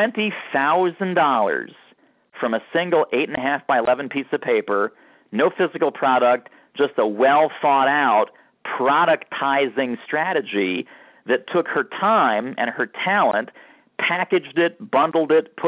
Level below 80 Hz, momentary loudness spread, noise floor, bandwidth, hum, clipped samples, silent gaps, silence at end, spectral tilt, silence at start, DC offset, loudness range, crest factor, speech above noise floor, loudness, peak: -70 dBFS; 8 LU; -57 dBFS; 4 kHz; none; under 0.1%; none; 0 s; -8.5 dB/octave; 0 s; under 0.1%; 3 LU; 14 dB; 37 dB; -20 LUFS; -6 dBFS